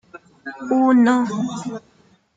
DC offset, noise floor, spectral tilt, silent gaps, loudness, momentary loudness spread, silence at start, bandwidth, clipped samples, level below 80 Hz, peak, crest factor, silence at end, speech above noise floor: under 0.1%; -38 dBFS; -6 dB/octave; none; -18 LUFS; 22 LU; 0.15 s; 7.8 kHz; under 0.1%; -66 dBFS; -6 dBFS; 16 dB; 0.55 s; 20 dB